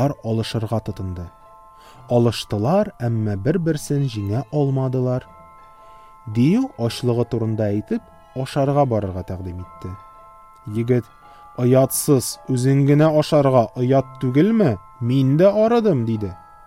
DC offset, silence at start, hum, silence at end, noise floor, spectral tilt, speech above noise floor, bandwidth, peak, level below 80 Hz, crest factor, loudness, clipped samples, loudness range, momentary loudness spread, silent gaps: under 0.1%; 0 s; none; 0.3 s; -45 dBFS; -7 dB/octave; 27 dB; 16 kHz; -4 dBFS; -50 dBFS; 16 dB; -20 LUFS; under 0.1%; 7 LU; 15 LU; none